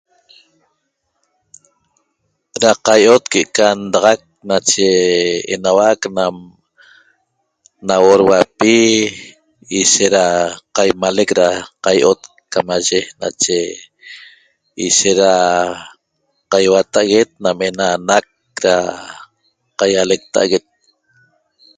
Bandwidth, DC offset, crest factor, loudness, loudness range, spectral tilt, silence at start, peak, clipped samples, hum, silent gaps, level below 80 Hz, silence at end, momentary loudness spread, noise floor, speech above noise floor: 9.6 kHz; under 0.1%; 16 dB; -14 LUFS; 4 LU; -2.5 dB/octave; 2.55 s; 0 dBFS; under 0.1%; none; none; -54 dBFS; 1.2 s; 12 LU; -69 dBFS; 56 dB